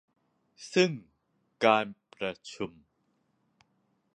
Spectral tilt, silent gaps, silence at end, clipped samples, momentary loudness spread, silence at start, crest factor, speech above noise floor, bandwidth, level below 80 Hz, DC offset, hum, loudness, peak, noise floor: -5 dB/octave; none; 1.45 s; under 0.1%; 15 LU; 0.6 s; 26 dB; 46 dB; 10.5 kHz; -74 dBFS; under 0.1%; none; -30 LUFS; -6 dBFS; -75 dBFS